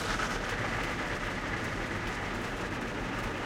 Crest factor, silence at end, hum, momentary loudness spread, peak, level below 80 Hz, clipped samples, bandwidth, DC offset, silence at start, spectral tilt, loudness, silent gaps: 16 dB; 0 s; none; 3 LU; -18 dBFS; -44 dBFS; under 0.1%; 16.5 kHz; under 0.1%; 0 s; -4.5 dB/octave; -34 LUFS; none